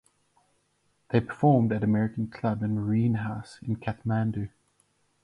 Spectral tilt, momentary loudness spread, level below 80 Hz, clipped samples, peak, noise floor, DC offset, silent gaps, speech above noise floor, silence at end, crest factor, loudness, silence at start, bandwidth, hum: -9.5 dB/octave; 12 LU; -56 dBFS; under 0.1%; -10 dBFS; -71 dBFS; under 0.1%; none; 45 dB; 0.75 s; 18 dB; -27 LUFS; 1.1 s; 10.5 kHz; none